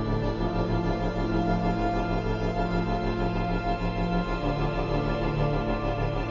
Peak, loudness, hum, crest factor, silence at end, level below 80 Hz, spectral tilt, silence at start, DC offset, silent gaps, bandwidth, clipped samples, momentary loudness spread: -12 dBFS; -28 LUFS; none; 14 dB; 0 s; -34 dBFS; -8 dB/octave; 0 s; under 0.1%; none; 7.4 kHz; under 0.1%; 2 LU